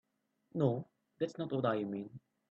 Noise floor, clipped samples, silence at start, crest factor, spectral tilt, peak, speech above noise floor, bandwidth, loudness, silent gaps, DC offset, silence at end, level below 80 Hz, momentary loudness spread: -76 dBFS; under 0.1%; 0.55 s; 20 dB; -8.5 dB/octave; -18 dBFS; 41 dB; 8.2 kHz; -37 LUFS; none; under 0.1%; 0.35 s; -78 dBFS; 12 LU